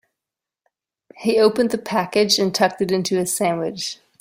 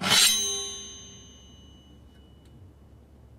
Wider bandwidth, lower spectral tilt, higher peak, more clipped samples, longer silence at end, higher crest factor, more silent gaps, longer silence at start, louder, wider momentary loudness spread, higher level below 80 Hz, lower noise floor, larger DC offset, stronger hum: about the same, 16.5 kHz vs 16 kHz; first, -3.5 dB/octave vs 0 dB/octave; first, -2 dBFS vs -6 dBFS; neither; second, 0.25 s vs 0.75 s; second, 18 dB vs 24 dB; neither; first, 1.15 s vs 0 s; about the same, -20 LUFS vs -22 LUFS; second, 9 LU vs 27 LU; second, -62 dBFS vs -56 dBFS; first, -86 dBFS vs -52 dBFS; neither; neither